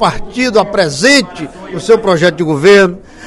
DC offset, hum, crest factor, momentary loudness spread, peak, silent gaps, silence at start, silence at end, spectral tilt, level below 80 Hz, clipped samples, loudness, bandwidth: under 0.1%; none; 10 dB; 15 LU; 0 dBFS; none; 0 s; 0 s; -4.5 dB/octave; -36 dBFS; 0.9%; -10 LUFS; 12 kHz